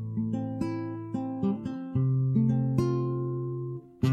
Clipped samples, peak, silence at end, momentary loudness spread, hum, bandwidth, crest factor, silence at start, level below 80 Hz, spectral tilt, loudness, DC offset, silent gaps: under 0.1%; -12 dBFS; 0 s; 9 LU; none; 6.8 kHz; 16 dB; 0 s; -56 dBFS; -9.5 dB/octave; -30 LUFS; under 0.1%; none